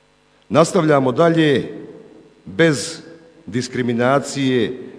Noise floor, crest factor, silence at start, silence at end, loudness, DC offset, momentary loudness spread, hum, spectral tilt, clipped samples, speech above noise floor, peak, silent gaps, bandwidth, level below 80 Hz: -56 dBFS; 18 dB; 0.5 s; 0 s; -17 LUFS; under 0.1%; 14 LU; none; -5.5 dB/octave; under 0.1%; 39 dB; 0 dBFS; none; 11 kHz; -58 dBFS